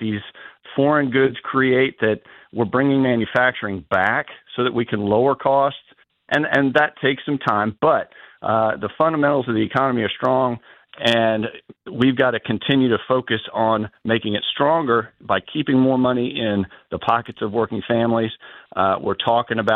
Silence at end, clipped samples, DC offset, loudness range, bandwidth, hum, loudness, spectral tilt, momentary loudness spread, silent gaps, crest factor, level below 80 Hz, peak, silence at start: 0 s; under 0.1%; under 0.1%; 1 LU; 8 kHz; none; -20 LUFS; -7 dB/octave; 9 LU; none; 16 dB; -58 dBFS; -2 dBFS; 0 s